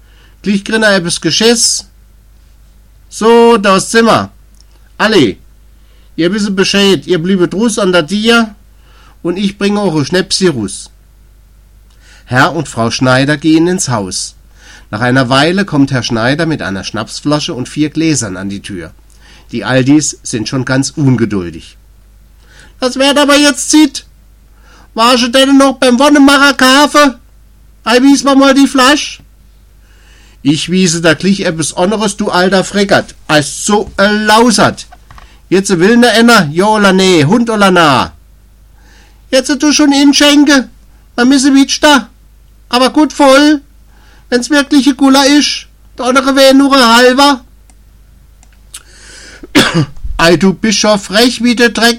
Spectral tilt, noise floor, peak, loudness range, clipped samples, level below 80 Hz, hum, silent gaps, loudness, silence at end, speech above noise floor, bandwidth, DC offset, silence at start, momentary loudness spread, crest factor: -4 dB/octave; -41 dBFS; 0 dBFS; 6 LU; 0.3%; -38 dBFS; none; none; -9 LUFS; 0 s; 32 dB; 16.5 kHz; 0.2%; 0.45 s; 12 LU; 10 dB